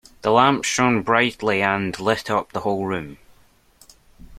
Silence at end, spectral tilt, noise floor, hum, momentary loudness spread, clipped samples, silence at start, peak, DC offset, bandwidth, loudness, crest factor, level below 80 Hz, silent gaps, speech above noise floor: 0 s; -4 dB/octave; -55 dBFS; none; 9 LU; under 0.1%; 0.25 s; 0 dBFS; under 0.1%; 15.5 kHz; -20 LUFS; 20 dB; -54 dBFS; none; 35 dB